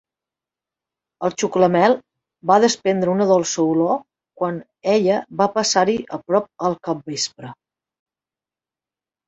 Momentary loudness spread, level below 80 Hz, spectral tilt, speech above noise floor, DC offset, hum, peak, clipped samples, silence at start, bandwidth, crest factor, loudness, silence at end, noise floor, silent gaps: 10 LU; -64 dBFS; -4.5 dB/octave; over 71 dB; under 0.1%; none; -2 dBFS; under 0.1%; 1.2 s; 8.2 kHz; 20 dB; -19 LUFS; 1.75 s; under -90 dBFS; none